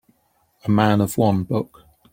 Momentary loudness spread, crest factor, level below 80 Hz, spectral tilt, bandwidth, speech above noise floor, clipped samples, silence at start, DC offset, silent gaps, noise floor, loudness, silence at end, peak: 12 LU; 18 dB; -54 dBFS; -7 dB/octave; 16.5 kHz; 46 dB; under 0.1%; 0.65 s; under 0.1%; none; -64 dBFS; -20 LUFS; 0.5 s; -2 dBFS